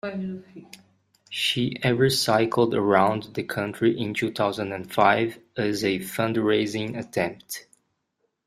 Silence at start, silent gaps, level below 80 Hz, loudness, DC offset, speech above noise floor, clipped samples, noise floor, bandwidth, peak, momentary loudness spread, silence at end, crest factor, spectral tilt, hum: 0.05 s; none; -60 dBFS; -24 LUFS; under 0.1%; 51 dB; under 0.1%; -75 dBFS; 15.5 kHz; -4 dBFS; 11 LU; 0.85 s; 22 dB; -5 dB/octave; none